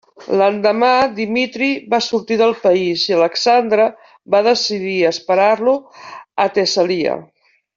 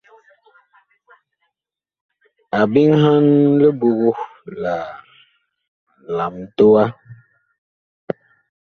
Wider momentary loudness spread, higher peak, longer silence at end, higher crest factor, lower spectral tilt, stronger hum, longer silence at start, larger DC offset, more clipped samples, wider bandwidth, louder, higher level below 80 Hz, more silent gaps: second, 6 LU vs 18 LU; about the same, -2 dBFS vs -2 dBFS; about the same, 0.5 s vs 0.55 s; about the same, 14 dB vs 16 dB; second, -4 dB/octave vs -9 dB/octave; neither; second, 0.2 s vs 2.55 s; neither; neither; first, 7.6 kHz vs 6.4 kHz; about the same, -16 LUFS vs -16 LUFS; about the same, -62 dBFS vs -60 dBFS; second, none vs 5.68-5.87 s, 7.58-8.08 s